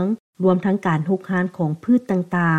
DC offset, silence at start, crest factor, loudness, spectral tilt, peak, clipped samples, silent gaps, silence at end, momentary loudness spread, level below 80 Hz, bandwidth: under 0.1%; 0 s; 14 dB; -21 LUFS; -9 dB/octave; -6 dBFS; under 0.1%; 0.20-0.33 s; 0 s; 5 LU; -64 dBFS; 8.8 kHz